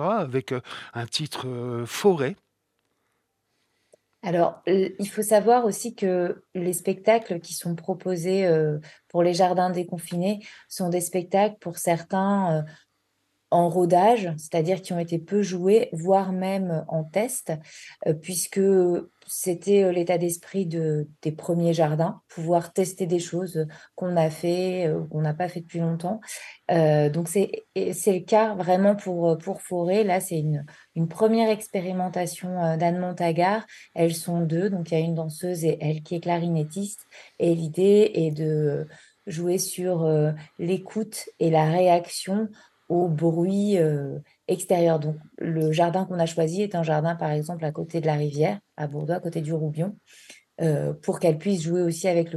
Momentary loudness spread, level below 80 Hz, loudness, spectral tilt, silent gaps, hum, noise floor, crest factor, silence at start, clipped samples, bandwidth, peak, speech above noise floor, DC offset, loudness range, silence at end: 10 LU; -72 dBFS; -25 LUFS; -6 dB/octave; none; none; -75 dBFS; 16 dB; 0 s; under 0.1%; 13 kHz; -8 dBFS; 51 dB; under 0.1%; 4 LU; 0 s